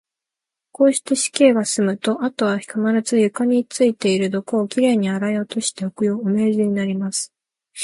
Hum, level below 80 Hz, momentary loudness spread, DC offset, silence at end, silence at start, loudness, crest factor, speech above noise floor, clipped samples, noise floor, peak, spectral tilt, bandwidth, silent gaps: none; -68 dBFS; 7 LU; under 0.1%; 0 s; 0.8 s; -19 LUFS; 18 dB; 67 dB; under 0.1%; -86 dBFS; -2 dBFS; -4.5 dB/octave; 11.5 kHz; none